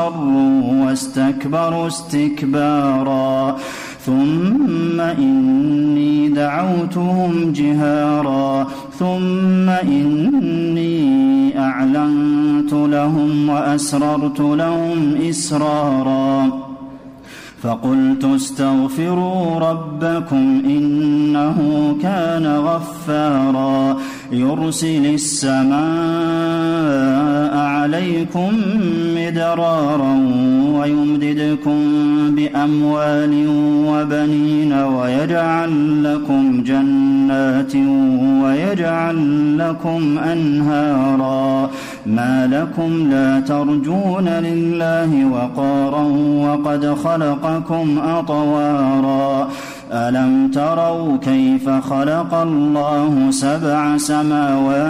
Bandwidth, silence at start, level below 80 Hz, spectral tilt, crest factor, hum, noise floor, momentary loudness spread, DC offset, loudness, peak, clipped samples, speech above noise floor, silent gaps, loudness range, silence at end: 12.5 kHz; 0 s; -54 dBFS; -6.5 dB/octave; 8 dB; none; -37 dBFS; 4 LU; under 0.1%; -16 LUFS; -8 dBFS; under 0.1%; 21 dB; none; 2 LU; 0 s